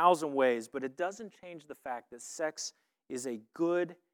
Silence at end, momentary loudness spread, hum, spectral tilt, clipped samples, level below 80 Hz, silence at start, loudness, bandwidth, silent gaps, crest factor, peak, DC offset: 0.2 s; 17 LU; none; -4 dB/octave; under 0.1%; -86 dBFS; 0 s; -34 LUFS; 17 kHz; none; 22 dB; -12 dBFS; under 0.1%